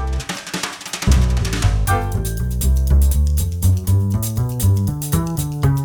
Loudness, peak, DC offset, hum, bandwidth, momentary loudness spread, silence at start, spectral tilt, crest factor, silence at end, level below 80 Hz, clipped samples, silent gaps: -19 LUFS; -2 dBFS; under 0.1%; none; over 20 kHz; 8 LU; 0 s; -5.5 dB/octave; 14 dB; 0 s; -20 dBFS; under 0.1%; none